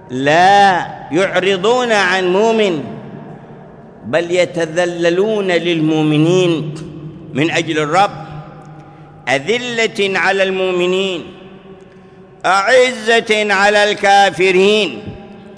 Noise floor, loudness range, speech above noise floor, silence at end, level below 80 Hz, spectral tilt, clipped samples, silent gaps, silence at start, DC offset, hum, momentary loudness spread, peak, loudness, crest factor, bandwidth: -40 dBFS; 5 LU; 27 dB; 0.05 s; -52 dBFS; -4.5 dB/octave; under 0.1%; none; 0.1 s; under 0.1%; none; 19 LU; 0 dBFS; -13 LUFS; 14 dB; 11 kHz